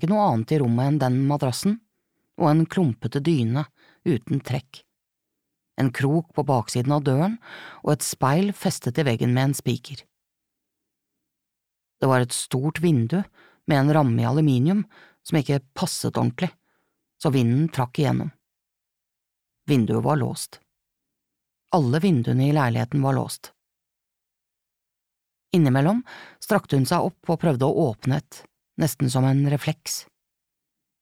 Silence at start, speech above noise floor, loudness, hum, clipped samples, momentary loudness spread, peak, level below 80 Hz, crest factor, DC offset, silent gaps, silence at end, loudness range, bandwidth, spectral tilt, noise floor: 0 s; 62 dB; -23 LUFS; none; under 0.1%; 10 LU; -6 dBFS; -62 dBFS; 18 dB; under 0.1%; none; 1 s; 5 LU; 16 kHz; -6.5 dB/octave; -84 dBFS